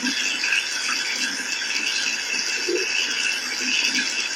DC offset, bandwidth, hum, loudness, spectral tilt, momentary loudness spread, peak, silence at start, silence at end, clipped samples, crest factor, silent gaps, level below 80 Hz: under 0.1%; 17 kHz; 50 Hz at -65 dBFS; -21 LUFS; 1 dB/octave; 3 LU; -8 dBFS; 0 s; 0 s; under 0.1%; 18 dB; none; -70 dBFS